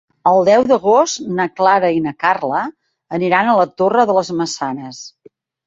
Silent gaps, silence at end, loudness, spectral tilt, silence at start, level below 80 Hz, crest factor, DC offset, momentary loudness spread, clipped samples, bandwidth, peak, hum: none; 0.6 s; -15 LUFS; -4.5 dB/octave; 0.25 s; -60 dBFS; 14 dB; under 0.1%; 14 LU; under 0.1%; 8 kHz; -2 dBFS; none